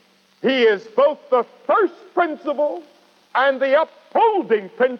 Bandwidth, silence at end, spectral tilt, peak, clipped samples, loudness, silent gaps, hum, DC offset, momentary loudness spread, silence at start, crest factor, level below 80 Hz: 6.4 kHz; 0 s; -5.5 dB/octave; -6 dBFS; under 0.1%; -19 LUFS; none; none; under 0.1%; 6 LU; 0.45 s; 14 dB; -88 dBFS